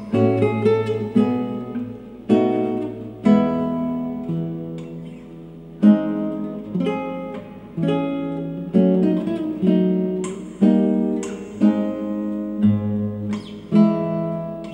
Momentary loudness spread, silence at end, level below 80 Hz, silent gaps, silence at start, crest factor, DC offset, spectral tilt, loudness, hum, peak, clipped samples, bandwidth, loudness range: 14 LU; 0 s; -54 dBFS; none; 0 s; 16 dB; under 0.1%; -8.5 dB/octave; -21 LUFS; none; -4 dBFS; under 0.1%; 9.4 kHz; 3 LU